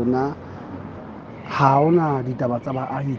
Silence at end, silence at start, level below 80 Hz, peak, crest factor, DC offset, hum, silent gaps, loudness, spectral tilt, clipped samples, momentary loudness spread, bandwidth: 0 s; 0 s; -56 dBFS; -2 dBFS; 20 dB; under 0.1%; none; none; -21 LUFS; -9 dB/octave; under 0.1%; 19 LU; 6.8 kHz